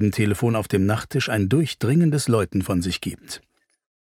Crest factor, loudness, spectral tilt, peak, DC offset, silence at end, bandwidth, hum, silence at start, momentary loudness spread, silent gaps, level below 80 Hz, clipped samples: 16 dB; -22 LUFS; -6 dB/octave; -6 dBFS; under 0.1%; 0.65 s; 16.5 kHz; none; 0 s; 11 LU; none; -50 dBFS; under 0.1%